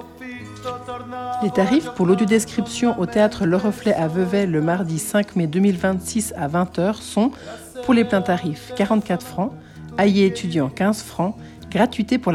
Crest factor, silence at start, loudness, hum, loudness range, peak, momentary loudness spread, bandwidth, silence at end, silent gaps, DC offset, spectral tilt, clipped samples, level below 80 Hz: 16 dB; 0 s; -20 LUFS; none; 2 LU; -4 dBFS; 13 LU; 14.5 kHz; 0 s; none; under 0.1%; -6 dB/octave; under 0.1%; -52 dBFS